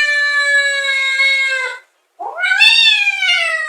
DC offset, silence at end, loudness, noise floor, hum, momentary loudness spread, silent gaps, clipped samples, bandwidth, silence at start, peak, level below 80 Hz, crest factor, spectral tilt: under 0.1%; 0 s; -11 LUFS; -36 dBFS; none; 12 LU; none; under 0.1%; 15.5 kHz; 0 s; 0 dBFS; -72 dBFS; 14 dB; 4 dB/octave